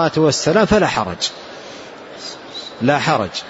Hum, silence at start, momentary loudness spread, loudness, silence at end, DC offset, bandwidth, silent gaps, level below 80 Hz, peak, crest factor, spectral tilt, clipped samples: none; 0 s; 19 LU; -16 LUFS; 0 s; under 0.1%; 8 kHz; none; -44 dBFS; -2 dBFS; 16 dB; -4.5 dB/octave; under 0.1%